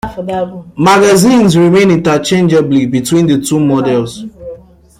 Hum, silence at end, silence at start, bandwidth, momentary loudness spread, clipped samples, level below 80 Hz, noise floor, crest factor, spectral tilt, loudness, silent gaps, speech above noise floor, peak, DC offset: none; 0.45 s; 0.05 s; 16 kHz; 15 LU; under 0.1%; -42 dBFS; -33 dBFS; 10 dB; -5.5 dB/octave; -10 LUFS; none; 23 dB; 0 dBFS; under 0.1%